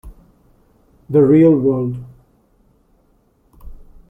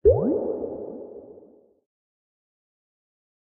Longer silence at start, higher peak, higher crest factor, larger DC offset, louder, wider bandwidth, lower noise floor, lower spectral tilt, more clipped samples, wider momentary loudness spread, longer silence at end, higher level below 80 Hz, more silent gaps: about the same, 0.05 s vs 0.05 s; first, -2 dBFS vs -6 dBFS; second, 16 dB vs 22 dB; neither; first, -14 LUFS vs -26 LUFS; first, 3.6 kHz vs 1.9 kHz; first, -57 dBFS vs -53 dBFS; about the same, -11.5 dB/octave vs -11 dB/octave; neither; second, 14 LU vs 22 LU; second, 0.35 s vs 2.1 s; about the same, -44 dBFS vs -44 dBFS; neither